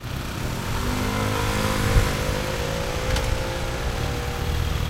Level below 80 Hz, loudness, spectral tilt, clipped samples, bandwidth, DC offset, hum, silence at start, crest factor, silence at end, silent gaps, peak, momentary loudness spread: -28 dBFS; -25 LUFS; -4.5 dB/octave; under 0.1%; 16 kHz; under 0.1%; none; 0 s; 18 dB; 0 s; none; -6 dBFS; 6 LU